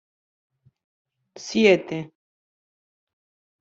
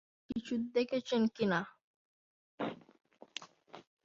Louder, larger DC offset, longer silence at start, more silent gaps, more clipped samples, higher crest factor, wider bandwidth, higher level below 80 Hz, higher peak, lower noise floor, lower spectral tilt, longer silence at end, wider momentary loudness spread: first, -21 LUFS vs -36 LUFS; neither; first, 1.35 s vs 0.3 s; second, none vs 1.84-2.58 s; neither; first, 24 dB vs 18 dB; about the same, 7.8 kHz vs 7.4 kHz; first, -68 dBFS vs -74 dBFS; first, -4 dBFS vs -20 dBFS; first, under -90 dBFS vs -56 dBFS; about the same, -5 dB/octave vs -4 dB/octave; first, 1.55 s vs 0.25 s; about the same, 21 LU vs 22 LU